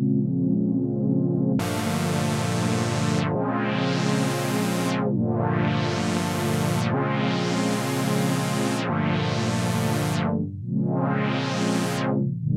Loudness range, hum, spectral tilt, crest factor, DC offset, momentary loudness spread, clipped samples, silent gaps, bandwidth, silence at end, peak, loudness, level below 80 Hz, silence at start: 1 LU; none; -6 dB/octave; 12 dB; under 0.1%; 2 LU; under 0.1%; none; 16 kHz; 0 s; -10 dBFS; -24 LUFS; -56 dBFS; 0 s